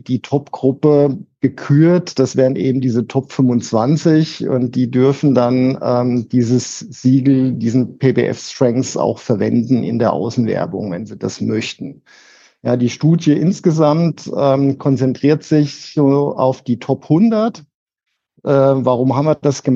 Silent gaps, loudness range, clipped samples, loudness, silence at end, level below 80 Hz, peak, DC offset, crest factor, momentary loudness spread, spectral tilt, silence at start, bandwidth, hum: 17.75-17.87 s; 3 LU; under 0.1%; -15 LUFS; 0 s; -62 dBFS; 0 dBFS; under 0.1%; 14 dB; 7 LU; -7.5 dB/octave; 0.1 s; 7.8 kHz; none